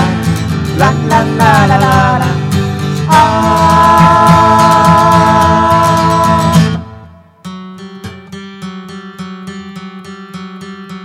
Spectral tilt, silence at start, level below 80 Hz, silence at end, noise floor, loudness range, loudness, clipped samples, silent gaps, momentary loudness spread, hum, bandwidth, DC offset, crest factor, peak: -6 dB/octave; 0 s; -32 dBFS; 0 s; -35 dBFS; 20 LU; -8 LUFS; 0.6%; none; 22 LU; none; 16 kHz; under 0.1%; 10 dB; 0 dBFS